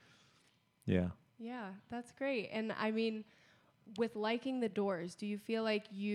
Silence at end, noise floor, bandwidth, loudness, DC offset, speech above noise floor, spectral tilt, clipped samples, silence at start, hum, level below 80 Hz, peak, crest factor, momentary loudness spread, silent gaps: 0 s; -72 dBFS; 12.5 kHz; -39 LUFS; under 0.1%; 34 dB; -6.5 dB/octave; under 0.1%; 0.85 s; none; -70 dBFS; -18 dBFS; 20 dB; 12 LU; none